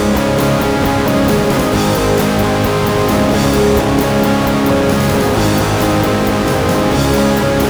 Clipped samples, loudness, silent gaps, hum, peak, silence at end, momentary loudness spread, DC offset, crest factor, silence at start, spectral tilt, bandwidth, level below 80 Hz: under 0.1%; -13 LUFS; none; none; -2 dBFS; 0 s; 1 LU; under 0.1%; 12 dB; 0 s; -5.5 dB/octave; over 20 kHz; -26 dBFS